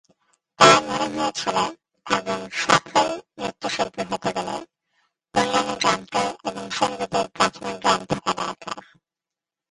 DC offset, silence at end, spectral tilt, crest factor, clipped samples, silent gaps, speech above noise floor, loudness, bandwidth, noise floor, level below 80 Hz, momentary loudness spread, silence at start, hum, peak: under 0.1%; 0.9 s; -3 dB/octave; 24 dB; under 0.1%; none; 65 dB; -22 LUFS; 11.5 kHz; -89 dBFS; -58 dBFS; 12 LU; 0.6 s; none; 0 dBFS